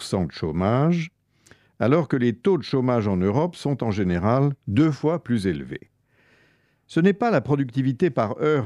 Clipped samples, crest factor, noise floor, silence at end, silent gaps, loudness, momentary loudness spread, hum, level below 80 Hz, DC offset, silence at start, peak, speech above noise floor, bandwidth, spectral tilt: under 0.1%; 16 dB; -62 dBFS; 0 s; none; -23 LUFS; 6 LU; none; -52 dBFS; under 0.1%; 0 s; -6 dBFS; 40 dB; 11.5 kHz; -8 dB/octave